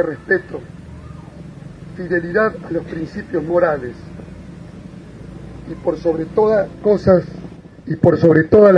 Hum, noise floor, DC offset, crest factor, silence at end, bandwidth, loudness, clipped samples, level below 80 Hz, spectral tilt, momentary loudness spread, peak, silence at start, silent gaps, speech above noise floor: none; -35 dBFS; under 0.1%; 18 dB; 0 s; 9.6 kHz; -17 LUFS; under 0.1%; -44 dBFS; -9 dB/octave; 23 LU; 0 dBFS; 0 s; none; 20 dB